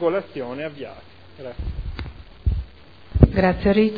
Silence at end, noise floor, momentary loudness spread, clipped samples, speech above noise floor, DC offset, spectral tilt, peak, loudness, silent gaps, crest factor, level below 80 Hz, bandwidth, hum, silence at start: 0 s; -46 dBFS; 21 LU; under 0.1%; 23 dB; 0.4%; -10.5 dB/octave; 0 dBFS; -23 LUFS; none; 22 dB; -30 dBFS; 5 kHz; none; 0 s